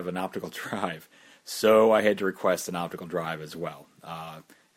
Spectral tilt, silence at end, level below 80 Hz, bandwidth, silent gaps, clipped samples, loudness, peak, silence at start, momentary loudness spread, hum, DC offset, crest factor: -4.5 dB/octave; 0.35 s; -70 dBFS; 16.5 kHz; none; under 0.1%; -26 LUFS; -8 dBFS; 0 s; 21 LU; none; under 0.1%; 20 dB